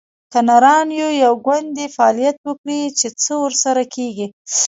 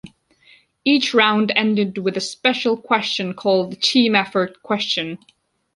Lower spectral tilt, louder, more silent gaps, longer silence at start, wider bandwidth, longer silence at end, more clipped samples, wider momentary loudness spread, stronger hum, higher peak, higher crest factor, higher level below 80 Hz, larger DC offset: second, -2 dB/octave vs -4 dB/octave; about the same, -16 LUFS vs -18 LUFS; first, 2.37-2.44 s, 2.58-2.64 s, 4.33-4.45 s vs none; first, 0.3 s vs 0.05 s; second, 8 kHz vs 11.5 kHz; second, 0 s vs 0.6 s; neither; first, 12 LU vs 8 LU; neither; about the same, 0 dBFS vs -2 dBFS; about the same, 16 dB vs 18 dB; second, -70 dBFS vs -64 dBFS; neither